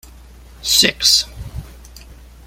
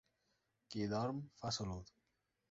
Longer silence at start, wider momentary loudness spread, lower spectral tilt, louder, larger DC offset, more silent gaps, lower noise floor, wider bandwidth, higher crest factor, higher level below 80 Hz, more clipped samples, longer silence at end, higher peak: about the same, 0.6 s vs 0.7 s; first, 22 LU vs 11 LU; second, -0.5 dB/octave vs -5.5 dB/octave; first, -13 LUFS vs -43 LUFS; neither; neither; second, -41 dBFS vs -85 dBFS; first, 16.5 kHz vs 7.6 kHz; about the same, 20 dB vs 18 dB; first, -38 dBFS vs -66 dBFS; neither; second, 0.25 s vs 0.6 s; first, 0 dBFS vs -28 dBFS